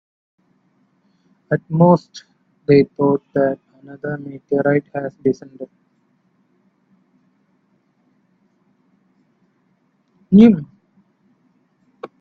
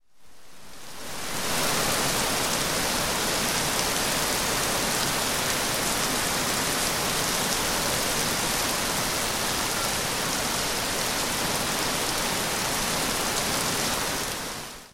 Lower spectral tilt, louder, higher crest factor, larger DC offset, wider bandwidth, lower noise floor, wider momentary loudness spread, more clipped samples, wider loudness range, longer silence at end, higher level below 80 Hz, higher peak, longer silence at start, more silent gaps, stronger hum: first, -9 dB/octave vs -1.5 dB/octave; first, -17 LUFS vs -24 LUFS; about the same, 20 dB vs 18 dB; neither; second, 6.4 kHz vs 17 kHz; first, -63 dBFS vs -51 dBFS; first, 26 LU vs 2 LU; neither; first, 7 LU vs 1 LU; first, 0.15 s vs 0 s; second, -58 dBFS vs -44 dBFS; first, 0 dBFS vs -8 dBFS; first, 1.5 s vs 0.2 s; neither; neither